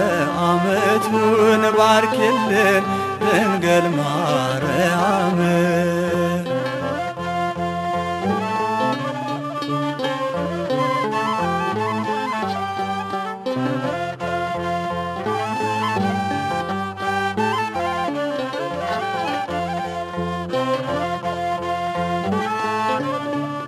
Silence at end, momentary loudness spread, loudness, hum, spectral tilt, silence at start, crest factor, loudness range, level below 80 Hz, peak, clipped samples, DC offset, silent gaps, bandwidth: 0 s; 8 LU; -21 LUFS; none; -5.5 dB/octave; 0 s; 18 dB; 7 LU; -54 dBFS; -2 dBFS; under 0.1%; under 0.1%; none; 14.5 kHz